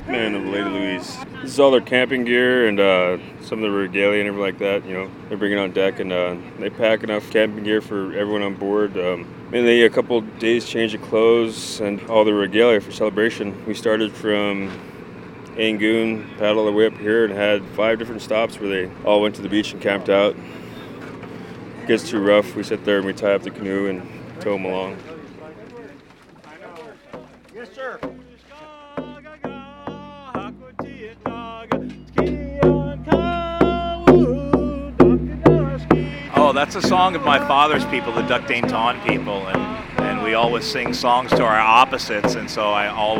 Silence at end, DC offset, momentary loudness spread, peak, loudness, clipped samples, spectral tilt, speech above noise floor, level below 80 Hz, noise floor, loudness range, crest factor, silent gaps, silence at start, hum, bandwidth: 0 s; under 0.1%; 19 LU; 0 dBFS; -19 LUFS; under 0.1%; -5.5 dB/octave; 27 dB; -42 dBFS; -46 dBFS; 16 LU; 20 dB; none; 0 s; none; 16.5 kHz